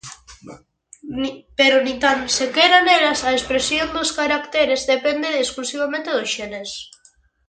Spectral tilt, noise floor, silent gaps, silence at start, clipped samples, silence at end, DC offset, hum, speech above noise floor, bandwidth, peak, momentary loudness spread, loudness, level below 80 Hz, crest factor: -1.5 dB/octave; -56 dBFS; none; 0.05 s; under 0.1%; 0.6 s; under 0.1%; none; 37 dB; 9.6 kHz; -2 dBFS; 13 LU; -18 LUFS; -50 dBFS; 18 dB